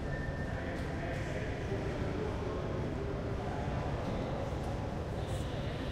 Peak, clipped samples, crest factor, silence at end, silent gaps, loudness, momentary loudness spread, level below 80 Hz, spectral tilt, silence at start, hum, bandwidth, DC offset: -24 dBFS; under 0.1%; 14 dB; 0 s; none; -37 LUFS; 2 LU; -44 dBFS; -7 dB/octave; 0 s; none; 14 kHz; under 0.1%